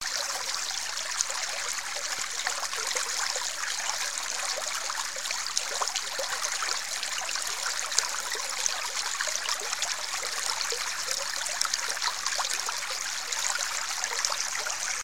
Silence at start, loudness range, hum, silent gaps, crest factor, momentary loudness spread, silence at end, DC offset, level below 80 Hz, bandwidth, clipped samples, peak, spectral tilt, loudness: 0 s; 1 LU; none; none; 30 dB; 3 LU; 0 s; 0.6%; -70 dBFS; 17 kHz; under 0.1%; 0 dBFS; 3 dB/octave; -29 LUFS